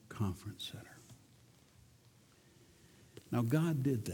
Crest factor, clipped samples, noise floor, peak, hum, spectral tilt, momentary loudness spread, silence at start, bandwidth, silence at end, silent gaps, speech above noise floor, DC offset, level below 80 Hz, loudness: 20 dB; under 0.1%; -65 dBFS; -20 dBFS; none; -7 dB/octave; 26 LU; 0.1 s; 19 kHz; 0 s; none; 30 dB; under 0.1%; -68 dBFS; -37 LUFS